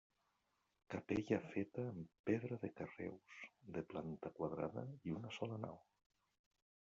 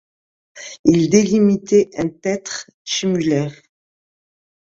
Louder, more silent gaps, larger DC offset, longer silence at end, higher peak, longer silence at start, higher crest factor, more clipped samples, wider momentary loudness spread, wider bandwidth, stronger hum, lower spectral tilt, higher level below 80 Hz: second, -46 LUFS vs -17 LUFS; second, 2.19-2.24 s vs 0.79-0.84 s, 2.74-2.85 s; neither; about the same, 1.05 s vs 1.15 s; second, -24 dBFS vs 0 dBFS; first, 0.9 s vs 0.55 s; about the same, 22 dB vs 18 dB; neither; second, 10 LU vs 15 LU; about the same, 7.6 kHz vs 7.8 kHz; neither; about the same, -6.5 dB/octave vs -5.5 dB/octave; second, -78 dBFS vs -56 dBFS